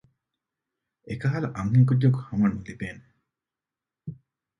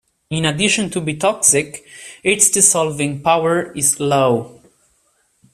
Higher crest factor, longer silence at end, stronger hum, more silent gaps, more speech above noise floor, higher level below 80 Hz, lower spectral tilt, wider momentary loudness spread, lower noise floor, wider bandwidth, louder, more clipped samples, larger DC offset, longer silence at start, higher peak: about the same, 18 dB vs 18 dB; second, 0.45 s vs 1 s; neither; neither; first, 66 dB vs 45 dB; about the same, -54 dBFS vs -54 dBFS; first, -9 dB/octave vs -3 dB/octave; first, 22 LU vs 10 LU; first, -90 dBFS vs -62 dBFS; second, 6.6 kHz vs 15.5 kHz; second, -24 LUFS vs -15 LUFS; neither; neither; first, 1.05 s vs 0.3 s; second, -8 dBFS vs 0 dBFS